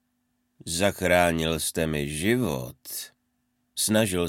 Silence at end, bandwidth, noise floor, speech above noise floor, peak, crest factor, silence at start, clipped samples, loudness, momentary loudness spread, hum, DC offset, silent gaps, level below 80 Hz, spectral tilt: 0 s; 17 kHz; -74 dBFS; 49 dB; -6 dBFS; 22 dB; 0.65 s; under 0.1%; -25 LUFS; 14 LU; none; under 0.1%; none; -48 dBFS; -4 dB/octave